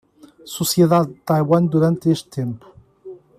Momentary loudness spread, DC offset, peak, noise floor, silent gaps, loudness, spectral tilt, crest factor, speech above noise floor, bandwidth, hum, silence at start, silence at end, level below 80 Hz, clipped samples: 13 LU; under 0.1%; -4 dBFS; -40 dBFS; none; -18 LUFS; -6.5 dB/octave; 16 dB; 23 dB; 15 kHz; none; 0.45 s; 0.2 s; -58 dBFS; under 0.1%